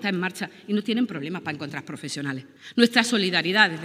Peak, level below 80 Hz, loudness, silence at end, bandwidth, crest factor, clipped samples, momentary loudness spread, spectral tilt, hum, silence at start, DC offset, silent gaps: 0 dBFS; -78 dBFS; -24 LUFS; 0 s; 15.5 kHz; 24 dB; under 0.1%; 14 LU; -4 dB/octave; none; 0 s; under 0.1%; none